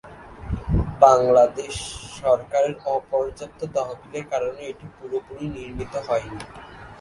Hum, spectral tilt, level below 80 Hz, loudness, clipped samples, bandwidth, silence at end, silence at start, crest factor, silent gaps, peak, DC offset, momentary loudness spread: none; -5.5 dB/octave; -38 dBFS; -23 LUFS; under 0.1%; 11.5 kHz; 0 s; 0.05 s; 22 dB; none; 0 dBFS; under 0.1%; 21 LU